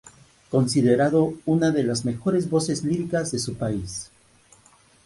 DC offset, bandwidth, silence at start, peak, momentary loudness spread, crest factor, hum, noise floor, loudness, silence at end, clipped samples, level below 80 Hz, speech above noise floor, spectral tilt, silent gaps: under 0.1%; 11.5 kHz; 0.05 s; -6 dBFS; 9 LU; 16 dB; none; -56 dBFS; -23 LUFS; 1 s; under 0.1%; -54 dBFS; 34 dB; -6 dB/octave; none